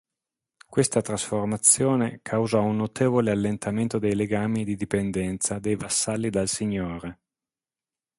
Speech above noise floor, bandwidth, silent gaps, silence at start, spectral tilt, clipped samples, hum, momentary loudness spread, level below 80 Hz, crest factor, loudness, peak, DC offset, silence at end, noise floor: over 65 dB; 12 kHz; none; 0.7 s; -4.5 dB/octave; under 0.1%; none; 8 LU; -52 dBFS; 22 dB; -24 LUFS; -4 dBFS; under 0.1%; 1.05 s; under -90 dBFS